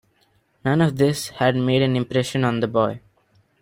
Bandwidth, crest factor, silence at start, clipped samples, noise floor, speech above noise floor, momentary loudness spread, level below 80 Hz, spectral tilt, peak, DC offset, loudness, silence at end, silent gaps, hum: 16 kHz; 18 dB; 0.65 s; under 0.1%; -63 dBFS; 43 dB; 5 LU; -56 dBFS; -6 dB/octave; -4 dBFS; under 0.1%; -21 LUFS; 0.65 s; none; none